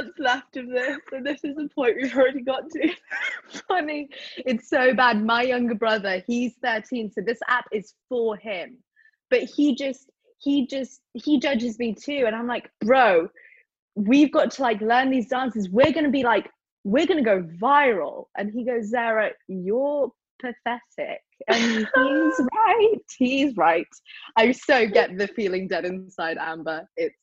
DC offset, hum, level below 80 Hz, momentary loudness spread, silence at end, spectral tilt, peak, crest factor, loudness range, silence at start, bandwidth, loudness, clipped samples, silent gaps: under 0.1%; none; -64 dBFS; 13 LU; 0.15 s; -5 dB/octave; -4 dBFS; 20 dB; 5 LU; 0 s; 8 kHz; -23 LUFS; under 0.1%; 13.79-13.88 s, 16.72-16.84 s, 20.30-20.39 s